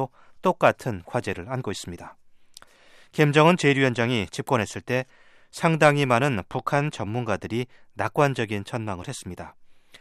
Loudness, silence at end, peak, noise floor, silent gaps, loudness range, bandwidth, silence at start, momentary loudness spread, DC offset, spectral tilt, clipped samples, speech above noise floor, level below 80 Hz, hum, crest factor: -24 LUFS; 0.3 s; -4 dBFS; -53 dBFS; none; 6 LU; 14 kHz; 0 s; 17 LU; under 0.1%; -5.5 dB/octave; under 0.1%; 29 dB; -62 dBFS; none; 22 dB